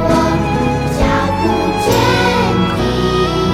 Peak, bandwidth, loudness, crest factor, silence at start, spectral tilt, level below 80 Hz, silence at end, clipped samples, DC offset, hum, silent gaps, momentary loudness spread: 0 dBFS; 16.5 kHz; -14 LUFS; 12 dB; 0 s; -5.5 dB/octave; -26 dBFS; 0 s; under 0.1%; under 0.1%; none; none; 3 LU